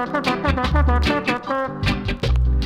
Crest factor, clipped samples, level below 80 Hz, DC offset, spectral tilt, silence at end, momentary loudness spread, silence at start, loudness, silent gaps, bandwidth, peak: 14 dB; under 0.1%; -22 dBFS; under 0.1%; -6.5 dB/octave; 0 s; 4 LU; 0 s; -21 LUFS; none; 11 kHz; -6 dBFS